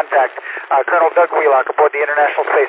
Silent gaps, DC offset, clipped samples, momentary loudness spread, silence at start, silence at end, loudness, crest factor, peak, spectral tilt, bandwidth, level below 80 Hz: none; under 0.1%; under 0.1%; 5 LU; 0 s; 0 s; -14 LUFS; 12 dB; -2 dBFS; -5 dB/octave; 4 kHz; -74 dBFS